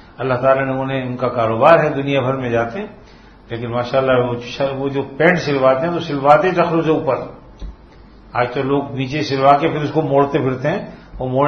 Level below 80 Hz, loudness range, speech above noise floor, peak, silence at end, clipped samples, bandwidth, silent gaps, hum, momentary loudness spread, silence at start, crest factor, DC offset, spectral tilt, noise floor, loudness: -44 dBFS; 3 LU; 26 dB; 0 dBFS; 0 s; under 0.1%; 6.6 kHz; none; none; 14 LU; 0.2 s; 16 dB; under 0.1%; -7 dB/octave; -42 dBFS; -17 LUFS